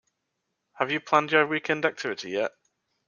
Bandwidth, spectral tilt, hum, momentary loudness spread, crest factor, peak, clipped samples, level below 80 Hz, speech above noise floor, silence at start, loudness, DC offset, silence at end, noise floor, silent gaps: 7.2 kHz; -4.5 dB/octave; none; 10 LU; 24 dB; -4 dBFS; under 0.1%; -76 dBFS; 55 dB; 0.8 s; -26 LUFS; under 0.1%; 0.6 s; -80 dBFS; none